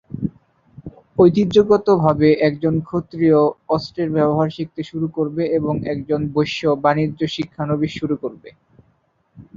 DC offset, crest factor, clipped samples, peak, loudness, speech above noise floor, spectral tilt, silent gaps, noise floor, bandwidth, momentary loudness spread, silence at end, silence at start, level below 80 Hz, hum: under 0.1%; 16 dB; under 0.1%; -2 dBFS; -19 LUFS; 45 dB; -8 dB/octave; none; -62 dBFS; 7.4 kHz; 11 LU; 0.15 s; 0.15 s; -50 dBFS; none